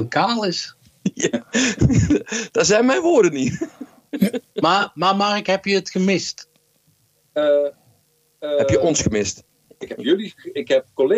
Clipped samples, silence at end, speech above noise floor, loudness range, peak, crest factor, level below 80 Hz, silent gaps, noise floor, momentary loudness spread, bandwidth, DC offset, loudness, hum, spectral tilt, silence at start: under 0.1%; 0 s; 42 dB; 4 LU; -4 dBFS; 16 dB; -42 dBFS; none; -61 dBFS; 14 LU; 15 kHz; under 0.1%; -19 LUFS; none; -4.5 dB/octave; 0 s